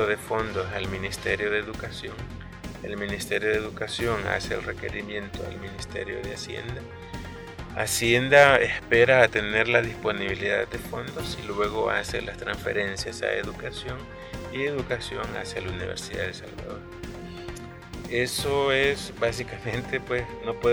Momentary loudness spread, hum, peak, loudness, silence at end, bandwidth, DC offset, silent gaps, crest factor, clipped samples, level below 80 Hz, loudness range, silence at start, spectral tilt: 17 LU; none; -2 dBFS; -26 LUFS; 0 s; over 20 kHz; under 0.1%; none; 24 dB; under 0.1%; -46 dBFS; 11 LU; 0 s; -4 dB/octave